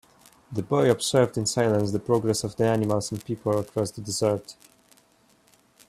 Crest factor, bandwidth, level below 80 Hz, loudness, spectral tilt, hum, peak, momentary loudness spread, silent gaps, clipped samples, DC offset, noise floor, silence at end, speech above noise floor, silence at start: 20 dB; 15 kHz; -60 dBFS; -25 LUFS; -5 dB/octave; none; -6 dBFS; 9 LU; none; under 0.1%; under 0.1%; -61 dBFS; 1.35 s; 37 dB; 0.5 s